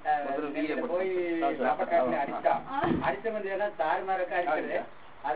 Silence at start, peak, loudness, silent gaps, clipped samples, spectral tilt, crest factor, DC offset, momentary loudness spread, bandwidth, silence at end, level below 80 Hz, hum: 0 s; -12 dBFS; -30 LUFS; none; under 0.1%; -9.5 dB/octave; 16 dB; 0.5%; 6 LU; 4 kHz; 0 s; -60 dBFS; none